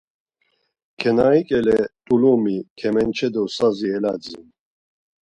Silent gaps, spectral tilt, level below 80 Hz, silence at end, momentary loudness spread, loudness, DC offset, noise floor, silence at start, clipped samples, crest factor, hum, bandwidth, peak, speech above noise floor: 2.70-2.76 s; -6.5 dB/octave; -54 dBFS; 0.95 s; 9 LU; -20 LUFS; under 0.1%; -69 dBFS; 1 s; under 0.1%; 16 dB; none; 10 kHz; -4 dBFS; 50 dB